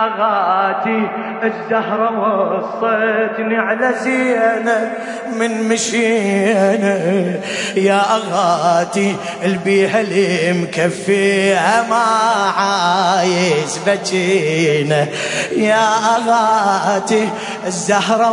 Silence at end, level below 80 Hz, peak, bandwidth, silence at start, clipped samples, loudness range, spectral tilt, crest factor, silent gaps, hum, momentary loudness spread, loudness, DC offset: 0 s; -66 dBFS; -2 dBFS; 11 kHz; 0 s; under 0.1%; 2 LU; -4.5 dB/octave; 14 dB; none; none; 6 LU; -15 LUFS; under 0.1%